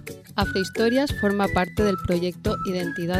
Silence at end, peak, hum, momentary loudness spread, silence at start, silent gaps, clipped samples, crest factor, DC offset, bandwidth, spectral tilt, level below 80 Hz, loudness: 0 s; -8 dBFS; none; 5 LU; 0 s; none; under 0.1%; 16 dB; under 0.1%; 16 kHz; -6 dB/octave; -40 dBFS; -24 LUFS